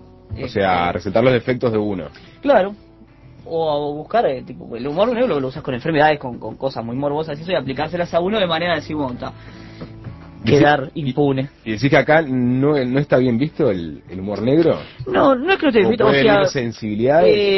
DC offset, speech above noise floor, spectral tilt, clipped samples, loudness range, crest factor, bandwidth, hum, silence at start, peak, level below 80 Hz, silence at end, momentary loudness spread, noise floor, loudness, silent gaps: under 0.1%; 27 dB; -7 dB/octave; under 0.1%; 5 LU; 16 dB; 6.2 kHz; none; 0.3 s; 0 dBFS; -44 dBFS; 0 s; 15 LU; -44 dBFS; -18 LUFS; none